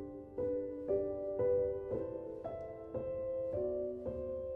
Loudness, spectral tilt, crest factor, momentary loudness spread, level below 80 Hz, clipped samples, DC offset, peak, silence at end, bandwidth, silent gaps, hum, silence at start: -39 LUFS; -11 dB/octave; 14 dB; 10 LU; -60 dBFS; under 0.1%; under 0.1%; -24 dBFS; 0 s; 3.4 kHz; none; none; 0 s